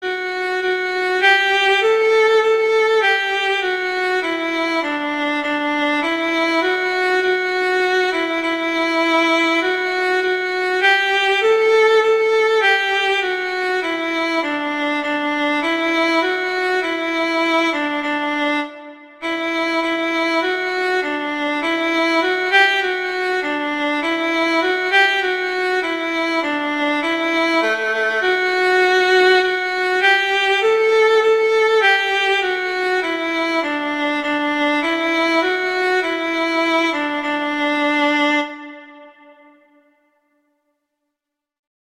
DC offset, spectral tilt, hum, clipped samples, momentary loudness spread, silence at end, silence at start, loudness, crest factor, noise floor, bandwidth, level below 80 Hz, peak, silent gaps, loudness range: 0.1%; -2 dB/octave; none; under 0.1%; 6 LU; 2.8 s; 0 s; -17 LUFS; 16 dB; -81 dBFS; 15.5 kHz; -64 dBFS; -2 dBFS; none; 5 LU